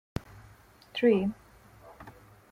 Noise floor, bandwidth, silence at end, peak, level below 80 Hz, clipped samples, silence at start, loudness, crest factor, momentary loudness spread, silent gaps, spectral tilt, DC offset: -56 dBFS; 15.5 kHz; 0.4 s; -12 dBFS; -56 dBFS; under 0.1%; 0.95 s; -29 LUFS; 20 dB; 25 LU; none; -7 dB/octave; under 0.1%